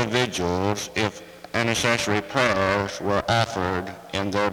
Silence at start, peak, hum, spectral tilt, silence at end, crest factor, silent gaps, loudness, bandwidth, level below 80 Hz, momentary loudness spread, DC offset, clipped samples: 0 s; -4 dBFS; none; -4 dB/octave; 0 s; 20 dB; none; -24 LUFS; over 20 kHz; -52 dBFS; 8 LU; under 0.1%; under 0.1%